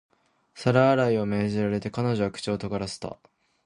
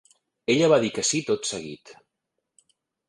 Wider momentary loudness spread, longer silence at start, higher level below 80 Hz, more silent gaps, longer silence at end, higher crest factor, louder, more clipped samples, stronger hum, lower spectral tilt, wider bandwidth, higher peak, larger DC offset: second, 12 LU vs 18 LU; about the same, 0.55 s vs 0.5 s; first, -56 dBFS vs -66 dBFS; neither; second, 0.5 s vs 1.15 s; about the same, 20 dB vs 20 dB; about the same, -25 LUFS vs -23 LUFS; neither; neither; first, -6.5 dB/octave vs -3.5 dB/octave; about the same, 11 kHz vs 11.5 kHz; about the same, -6 dBFS vs -6 dBFS; neither